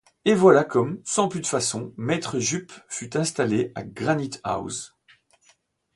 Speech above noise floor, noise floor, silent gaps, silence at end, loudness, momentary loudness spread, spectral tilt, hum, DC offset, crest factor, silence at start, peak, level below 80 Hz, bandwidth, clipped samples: 40 dB; -63 dBFS; none; 1.1 s; -24 LUFS; 15 LU; -4.5 dB/octave; none; under 0.1%; 22 dB; 0.25 s; -4 dBFS; -60 dBFS; 11.5 kHz; under 0.1%